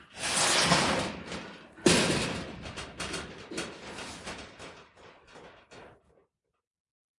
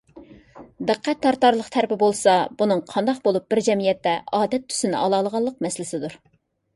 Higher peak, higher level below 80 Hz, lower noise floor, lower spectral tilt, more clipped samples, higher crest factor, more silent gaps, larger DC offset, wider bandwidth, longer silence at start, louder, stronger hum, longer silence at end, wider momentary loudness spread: second, -8 dBFS vs -4 dBFS; first, -56 dBFS vs -62 dBFS; first, -78 dBFS vs -46 dBFS; second, -2.5 dB/octave vs -4.5 dB/octave; neither; first, 26 dB vs 18 dB; neither; neither; about the same, 11.5 kHz vs 11.5 kHz; second, 0 s vs 0.15 s; second, -28 LUFS vs -22 LUFS; neither; first, 1.3 s vs 0.6 s; first, 19 LU vs 9 LU